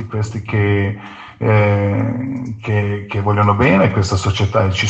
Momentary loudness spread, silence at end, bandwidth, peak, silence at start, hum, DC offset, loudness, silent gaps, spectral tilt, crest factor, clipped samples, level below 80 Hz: 10 LU; 0 s; 8.2 kHz; -2 dBFS; 0 s; none; under 0.1%; -16 LUFS; none; -6.5 dB/octave; 14 dB; under 0.1%; -42 dBFS